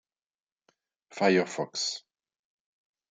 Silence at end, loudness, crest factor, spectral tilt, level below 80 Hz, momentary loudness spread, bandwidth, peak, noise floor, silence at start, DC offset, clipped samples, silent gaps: 1.15 s; -28 LUFS; 22 dB; -4 dB/octave; -82 dBFS; 15 LU; 9.6 kHz; -10 dBFS; -73 dBFS; 1.1 s; under 0.1%; under 0.1%; none